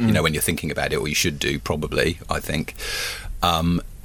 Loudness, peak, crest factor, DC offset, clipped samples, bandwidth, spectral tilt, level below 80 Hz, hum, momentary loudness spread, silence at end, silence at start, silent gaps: -23 LUFS; -4 dBFS; 18 dB; under 0.1%; under 0.1%; 19 kHz; -4 dB/octave; -36 dBFS; none; 7 LU; 0 s; 0 s; none